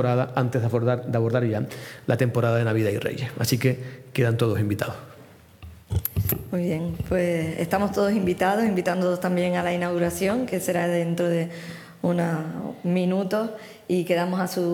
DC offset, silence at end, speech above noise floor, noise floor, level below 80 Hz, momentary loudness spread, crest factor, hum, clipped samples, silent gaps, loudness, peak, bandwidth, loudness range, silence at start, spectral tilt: under 0.1%; 0 s; 25 dB; -49 dBFS; -50 dBFS; 7 LU; 22 dB; none; under 0.1%; none; -25 LUFS; -2 dBFS; 19.5 kHz; 3 LU; 0 s; -6.5 dB/octave